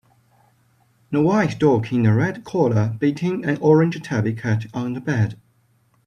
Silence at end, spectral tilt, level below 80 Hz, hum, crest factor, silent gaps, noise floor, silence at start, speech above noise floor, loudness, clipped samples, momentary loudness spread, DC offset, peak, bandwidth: 0.7 s; -8 dB/octave; -58 dBFS; none; 18 dB; none; -61 dBFS; 1.1 s; 42 dB; -20 LUFS; under 0.1%; 7 LU; under 0.1%; -2 dBFS; 9.8 kHz